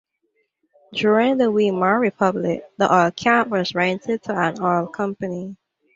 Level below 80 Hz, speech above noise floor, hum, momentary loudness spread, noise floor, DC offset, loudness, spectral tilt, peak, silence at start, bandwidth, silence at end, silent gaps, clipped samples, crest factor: -62 dBFS; 50 dB; none; 10 LU; -70 dBFS; under 0.1%; -20 LUFS; -6 dB/octave; -2 dBFS; 0.9 s; 7.8 kHz; 0.4 s; none; under 0.1%; 18 dB